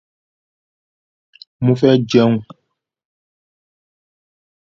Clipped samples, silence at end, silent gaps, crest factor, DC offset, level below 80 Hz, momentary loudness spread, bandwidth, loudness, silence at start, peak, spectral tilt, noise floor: under 0.1%; 2.35 s; none; 20 dB; under 0.1%; -58 dBFS; 8 LU; 7.4 kHz; -15 LUFS; 1.6 s; 0 dBFS; -7.5 dB/octave; -72 dBFS